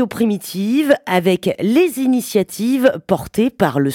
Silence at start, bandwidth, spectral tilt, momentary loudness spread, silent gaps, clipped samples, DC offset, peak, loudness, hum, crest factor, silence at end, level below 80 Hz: 0 s; 18 kHz; -5.5 dB/octave; 4 LU; none; under 0.1%; under 0.1%; -2 dBFS; -17 LUFS; none; 16 dB; 0 s; -52 dBFS